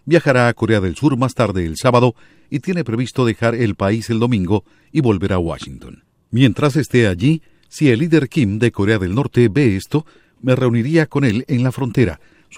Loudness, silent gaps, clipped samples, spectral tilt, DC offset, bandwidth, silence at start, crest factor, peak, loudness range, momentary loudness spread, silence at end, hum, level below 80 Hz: -17 LUFS; none; under 0.1%; -7 dB/octave; under 0.1%; 15 kHz; 0.05 s; 16 dB; 0 dBFS; 2 LU; 8 LU; 0 s; none; -44 dBFS